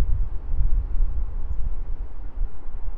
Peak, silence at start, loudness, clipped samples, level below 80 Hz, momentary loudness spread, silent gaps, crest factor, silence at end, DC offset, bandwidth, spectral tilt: -6 dBFS; 0 s; -32 LUFS; under 0.1%; -24 dBFS; 9 LU; none; 14 dB; 0 s; under 0.1%; 1.7 kHz; -10.5 dB/octave